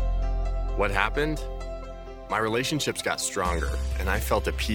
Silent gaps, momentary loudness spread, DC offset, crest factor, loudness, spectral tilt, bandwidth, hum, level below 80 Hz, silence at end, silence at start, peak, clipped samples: none; 12 LU; under 0.1%; 22 dB; -27 LUFS; -4 dB/octave; 18 kHz; none; -30 dBFS; 0 s; 0 s; -6 dBFS; under 0.1%